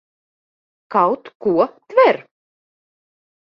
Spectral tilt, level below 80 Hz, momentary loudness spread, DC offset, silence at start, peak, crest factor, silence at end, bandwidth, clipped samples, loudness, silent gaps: -7.5 dB/octave; -68 dBFS; 8 LU; under 0.1%; 0.9 s; -2 dBFS; 20 dB; 1.3 s; 5.8 kHz; under 0.1%; -18 LUFS; 1.35-1.40 s